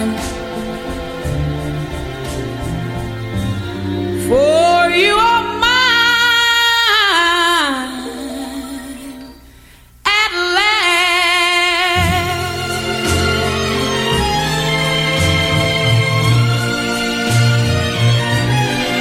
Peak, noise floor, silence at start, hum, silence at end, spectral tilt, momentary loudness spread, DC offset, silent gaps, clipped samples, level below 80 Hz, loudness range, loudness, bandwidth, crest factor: -2 dBFS; -43 dBFS; 0 s; none; 0 s; -4 dB/octave; 14 LU; under 0.1%; none; under 0.1%; -34 dBFS; 8 LU; -14 LUFS; 16.5 kHz; 14 dB